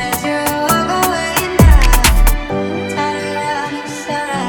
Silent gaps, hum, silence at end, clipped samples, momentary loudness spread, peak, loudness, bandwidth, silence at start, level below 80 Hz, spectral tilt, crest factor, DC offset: none; none; 0 s; under 0.1%; 10 LU; 0 dBFS; -15 LUFS; 19.5 kHz; 0 s; -16 dBFS; -4.5 dB/octave; 14 dB; under 0.1%